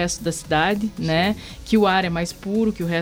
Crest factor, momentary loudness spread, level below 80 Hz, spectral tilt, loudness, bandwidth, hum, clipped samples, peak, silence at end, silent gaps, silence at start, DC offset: 16 dB; 7 LU; -42 dBFS; -5 dB/octave; -21 LUFS; 16.5 kHz; none; under 0.1%; -6 dBFS; 0 s; none; 0 s; under 0.1%